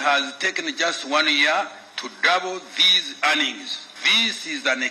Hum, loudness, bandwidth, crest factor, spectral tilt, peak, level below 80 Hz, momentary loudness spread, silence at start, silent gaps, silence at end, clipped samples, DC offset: none; -19 LUFS; 13 kHz; 18 dB; 0 dB/octave; -4 dBFS; -84 dBFS; 14 LU; 0 s; none; 0 s; under 0.1%; under 0.1%